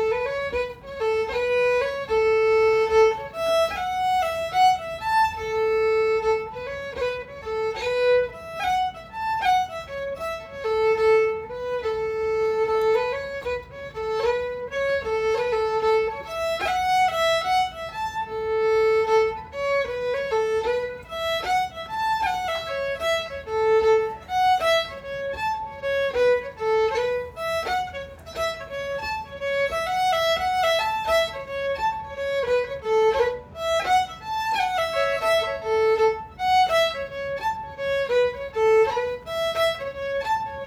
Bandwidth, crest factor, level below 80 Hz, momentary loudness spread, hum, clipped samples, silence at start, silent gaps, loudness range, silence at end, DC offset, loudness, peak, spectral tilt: 18 kHz; 16 dB; -50 dBFS; 10 LU; none; under 0.1%; 0 s; none; 4 LU; 0 s; under 0.1%; -24 LUFS; -8 dBFS; -2.5 dB/octave